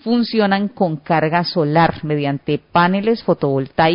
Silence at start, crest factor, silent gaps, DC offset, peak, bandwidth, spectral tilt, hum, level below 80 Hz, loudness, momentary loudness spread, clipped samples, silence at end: 0.05 s; 14 dB; none; under 0.1%; -2 dBFS; 5.4 kHz; -11 dB/octave; none; -50 dBFS; -17 LUFS; 5 LU; under 0.1%; 0 s